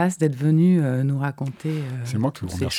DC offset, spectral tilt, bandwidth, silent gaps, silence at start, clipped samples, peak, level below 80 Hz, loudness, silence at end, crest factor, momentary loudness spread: under 0.1%; -7 dB/octave; 13.5 kHz; none; 0 s; under 0.1%; -8 dBFS; -52 dBFS; -22 LUFS; 0 s; 14 dB; 10 LU